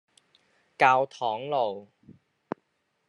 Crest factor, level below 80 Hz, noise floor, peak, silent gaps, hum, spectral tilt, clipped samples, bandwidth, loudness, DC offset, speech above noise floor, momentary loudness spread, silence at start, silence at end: 24 dB; -82 dBFS; -74 dBFS; -4 dBFS; none; none; -4.5 dB/octave; under 0.1%; 11 kHz; -25 LUFS; under 0.1%; 49 dB; 19 LU; 0.8 s; 1.25 s